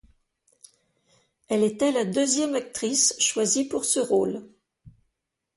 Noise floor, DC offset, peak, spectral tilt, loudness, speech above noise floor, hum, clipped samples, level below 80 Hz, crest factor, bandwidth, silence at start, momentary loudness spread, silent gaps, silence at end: -81 dBFS; under 0.1%; -8 dBFS; -2.5 dB/octave; -23 LUFS; 57 dB; none; under 0.1%; -66 dBFS; 18 dB; 12 kHz; 1.5 s; 7 LU; none; 0.7 s